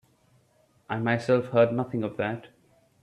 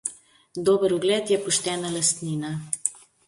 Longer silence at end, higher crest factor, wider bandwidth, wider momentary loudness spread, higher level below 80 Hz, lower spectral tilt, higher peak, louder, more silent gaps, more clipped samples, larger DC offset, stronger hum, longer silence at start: first, 0.55 s vs 0.3 s; about the same, 18 dB vs 22 dB; about the same, 10.5 kHz vs 11.5 kHz; about the same, 10 LU vs 8 LU; about the same, -68 dBFS vs -66 dBFS; first, -7.5 dB/octave vs -3.5 dB/octave; second, -10 dBFS vs -4 dBFS; about the same, -26 LUFS vs -24 LUFS; neither; neither; neither; neither; first, 0.9 s vs 0.05 s